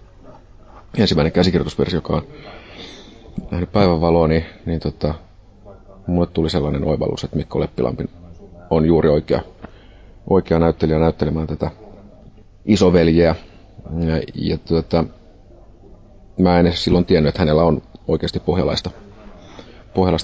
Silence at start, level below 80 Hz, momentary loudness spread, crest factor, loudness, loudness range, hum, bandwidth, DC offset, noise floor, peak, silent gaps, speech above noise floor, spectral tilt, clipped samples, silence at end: 0.3 s; -32 dBFS; 16 LU; 18 dB; -18 LUFS; 4 LU; none; 8 kHz; under 0.1%; -44 dBFS; -2 dBFS; none; 27 dB; -7.5 dB/octave; under 0.1%; 0 s